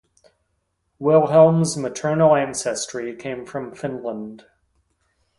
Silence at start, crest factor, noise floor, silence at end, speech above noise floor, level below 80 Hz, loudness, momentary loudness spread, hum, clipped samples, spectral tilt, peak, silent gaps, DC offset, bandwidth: 1 s; 20 dB; -72 dBFS; 1 s; 52 dB; -58 dBFS; -20 LUFS; 17 LU; none; under 0.1%; -5.5 dB/octave; -2 dBFS; none; under 0.1%; 11.5 kHz